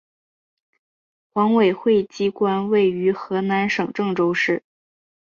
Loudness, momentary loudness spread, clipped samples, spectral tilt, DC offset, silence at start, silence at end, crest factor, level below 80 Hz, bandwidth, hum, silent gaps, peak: -20 LUFS; 6 LU; under 0.1%; -6.5 dB/octave; under 0.1%; 1.35 s; 0.8 s; 16 dB; -64 dBFS; 7.2 kHz; none; none; -6 dBFS